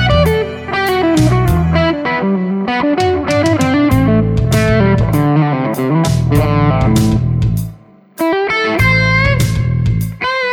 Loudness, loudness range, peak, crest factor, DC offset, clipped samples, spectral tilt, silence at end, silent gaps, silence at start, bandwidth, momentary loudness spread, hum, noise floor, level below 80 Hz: -13 LUFS; 2 LU; 0 dBFS; 12 dB; under 0.1%; under 0.1%; -6.5 dB/octave; 0 s; none; 0 s; 18 kHz; 5 LU; none; -37 dBFS; -26 dBFS